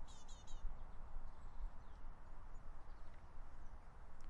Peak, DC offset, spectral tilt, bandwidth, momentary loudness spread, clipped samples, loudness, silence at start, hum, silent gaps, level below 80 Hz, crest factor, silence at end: -32 dBFS; under 0.1%; -5 dB/octave; 7.8 kHz; 6 LU; under 0.1%; -59 LUFS; 0 s; none; none; -50 dBFS; 14 dB; 0 s